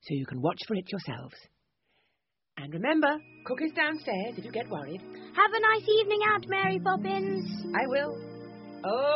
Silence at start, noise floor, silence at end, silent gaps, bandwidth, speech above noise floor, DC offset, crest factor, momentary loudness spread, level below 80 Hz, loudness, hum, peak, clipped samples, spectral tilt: 0.05 s; -82 dBFS; 0 s; none; 5.8 kHz; 53 dB; under 0.1%; 20 dB; 17 LU; -72 dBFS; -28 LUFS; none; -10 dBFS; under 0.1%; -3 dB/octave